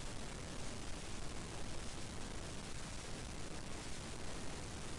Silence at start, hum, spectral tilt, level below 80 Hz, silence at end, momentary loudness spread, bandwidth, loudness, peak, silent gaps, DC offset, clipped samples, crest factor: 0 s; none; -3.5 dB/octave; -52 dBFS; 0 s; 0 LU; 11.5 kHz; -48 LUFS; -32 dBFS; none; under 0.1%; under 0.1%; 12 dB